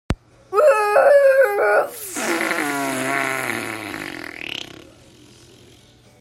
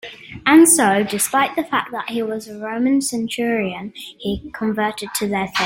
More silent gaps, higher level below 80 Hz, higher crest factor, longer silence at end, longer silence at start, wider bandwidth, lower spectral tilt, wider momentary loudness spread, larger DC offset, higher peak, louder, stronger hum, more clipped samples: neither; first, -44 dBFS vs -50 dBFS; about the same, 16 dB vs 18 dB; first, 1.55 s vs 0 s; about the same, 0.1 s vs 0.05 s; about the same, 16 kHz vs 16.5 kHz; about the same, -3.5 dB/octave vs -3 dB/octave; about the same, 16 LU vs 16 LU; neither; about the same, -4 dBFS vs -2 dBFS; about the same, -19 LUFS vs -18 LUFS; neither; neither